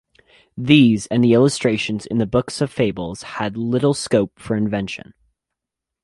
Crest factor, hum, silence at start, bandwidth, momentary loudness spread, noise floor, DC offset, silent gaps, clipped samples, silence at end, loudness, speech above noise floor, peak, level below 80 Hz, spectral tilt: 18 dB; none; 0.55 s; 11.5 kHz; 15 LU; -84 dBFS; under 0.1%; none; under 0.1%; 1.05 s; -19 LUFS; 66 dB; -2 dBFS; -50 dBFS; -6 dB/octave